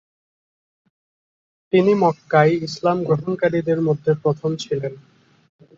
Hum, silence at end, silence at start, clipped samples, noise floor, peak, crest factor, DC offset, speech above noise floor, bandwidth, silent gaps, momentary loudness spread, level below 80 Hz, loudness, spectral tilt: none; 0.8 s; 1.75 s; under 0.1%; under -90 dBFS; -4 dBFS; 18 dB; under 0.1%; over 71 dB; 7.6 kHz; none; 8 LU; -62 dBFS; -19 LUFS; -7 dB/octave